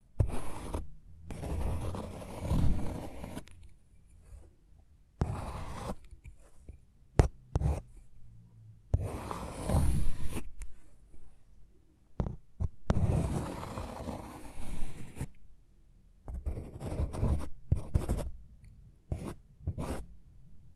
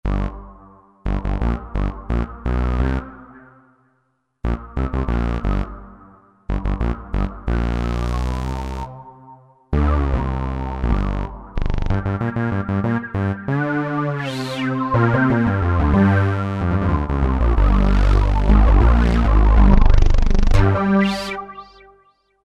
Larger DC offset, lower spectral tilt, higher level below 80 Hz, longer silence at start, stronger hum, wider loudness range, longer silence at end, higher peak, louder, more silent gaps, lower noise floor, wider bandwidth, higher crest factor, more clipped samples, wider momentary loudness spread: neither; about the same, -7 dB/octave vs -8 dB/octave; second, -40 dBFS vs -20 dBFS; about the same, 0.15 s vs 0.05 s; neither; about the same, 7 LU vs 9 LU; second, 0.05 s vs 0.8 s; second, -6 dBFS vs 0 dBFS; second, -37 LUFS vs -20 LUFS; neither; second, -60 dBFS vs -67 dBFS; first, 13 kHz vs 7.4 kHz; first, 28 dB vs 18 dB; neither; first, 24 LU vs 12 LU